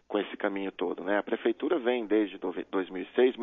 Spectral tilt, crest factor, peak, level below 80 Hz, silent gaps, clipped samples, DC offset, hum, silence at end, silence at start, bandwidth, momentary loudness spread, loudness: -8 dB/octave; 18 dB; -12 dBFS; -72 dBFS; none; under 0.1%; under 0.1%; none; 0 s; 0.1 s; 3.9 kHz; 6 LU; -30 LUFS